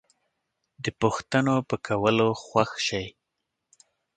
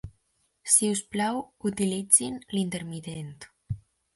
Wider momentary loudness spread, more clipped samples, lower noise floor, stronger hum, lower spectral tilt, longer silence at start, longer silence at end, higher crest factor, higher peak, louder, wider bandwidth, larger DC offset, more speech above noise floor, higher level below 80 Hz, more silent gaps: second, 11 LU vs 18 LU; neither; first, -82 dBFS vs -72 dBFS; neither; first, -5 dB/octave vs -3.5 dB/octave; first, 0.8 s vs 0.05 s; first, 1.05 s vs 0.4 s; about the same, 22 dB vs 26 dB; about the same, -4 dBFS vs -2 dBFS; about the same, -26 LUFS vs -25 LUFS; second, 9.4 kHz vs 12 kHz; neither; first, 57 dB vs 45 dB; about the same, -58 dBFS vs -56 dBFS; neither